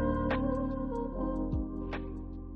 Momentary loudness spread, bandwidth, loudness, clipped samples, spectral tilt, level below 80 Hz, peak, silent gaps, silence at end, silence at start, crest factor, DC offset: 9 LU; 5.8 kHz; -35 LUFS; under 0.1%; -9.5 dB/octave; -40 dBFS; -18 dBFS; none; 0 s; 0 s; 14 dB; under 0.1%